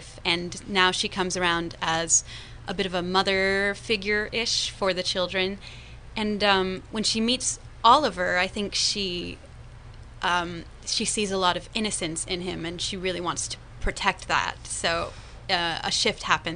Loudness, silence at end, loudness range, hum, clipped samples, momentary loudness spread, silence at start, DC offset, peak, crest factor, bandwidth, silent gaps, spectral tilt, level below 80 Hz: -25 LUFS; 0 s; 4 LU; none; under 0.1%; 11 LU; 0 s; under 0.1%; -4 dBFS; 24 dB; 10.5 kHz; none; -2.5 dB/octave; -46 dBFS